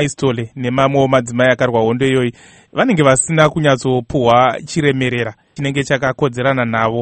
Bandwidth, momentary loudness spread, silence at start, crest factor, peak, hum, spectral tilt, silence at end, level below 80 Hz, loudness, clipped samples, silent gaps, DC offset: 9 kHz; 8 LU; 0 s; 14 dB; 0 dBFS; none; -5 dB/octave; 0 s; -46 dBFS; -15 LUFS; under 0.1%; none; under 0.1%